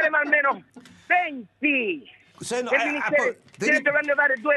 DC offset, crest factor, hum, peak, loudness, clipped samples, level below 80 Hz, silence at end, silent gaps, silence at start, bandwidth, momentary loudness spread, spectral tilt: under 0.1%; 18 dB; none; -6 dBFS; -22 LUFS; under 0.1%; -76 dBFS; 0 s; none; 0 s; 12 kHz; 11 LU; -3.5 dB/octave